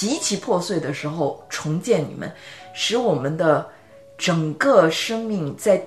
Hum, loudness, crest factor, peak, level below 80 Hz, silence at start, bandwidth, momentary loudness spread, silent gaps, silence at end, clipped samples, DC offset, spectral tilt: none; -21 LUFS; 20 dB; -2 dBFS; -64 dBFS; 0 s; 13.5 kHz; 14 LU; none; 0 s; under 0.1%; 0.1%; -4.5 dB/octave